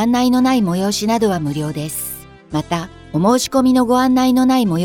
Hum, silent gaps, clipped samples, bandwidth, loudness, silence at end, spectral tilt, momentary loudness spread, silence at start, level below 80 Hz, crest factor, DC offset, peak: none; none; under 0.1%; 18.5 kHz; -16 LUFS; 0 s; -5.5 dB/octave; 11 LU; 0 s; -46 dBFS; 12 dB; under 0.1%; -4 dBFS